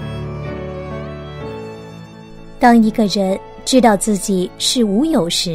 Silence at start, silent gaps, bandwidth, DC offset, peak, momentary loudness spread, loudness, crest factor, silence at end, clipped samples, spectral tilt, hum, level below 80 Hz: 0 s; none; 16 kHz; under 0.1%; 0 dBFS; 18 LU; -15 LUFS; 16 dB; 0 s; under 0.1%; -4.5 dB/octave; none; -38 dBFS